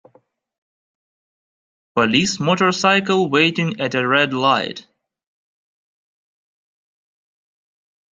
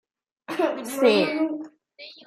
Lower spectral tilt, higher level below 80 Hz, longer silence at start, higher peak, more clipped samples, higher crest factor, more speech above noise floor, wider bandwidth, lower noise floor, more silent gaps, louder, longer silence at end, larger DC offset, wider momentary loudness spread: about the same, -4.5 dB/octave vs -4.5 dB/octave; first, -62 dBFS vs -78 dBFS; first, 1.95 s vs 0.5 s; first, -2 dBFS vs -6 dBFS; neither; about the same, 20 dB vs 18 dB; first, 40 dB vs 25 dB; second, 9.4 kHz vs 15 kHz; first, -58 dBFS vs -47 dBFS; neither; first, -17 LUFS vs -23 LUFS; first, 3.3 s vs 0.15 s; neither; second, 6 LU vs 24 LU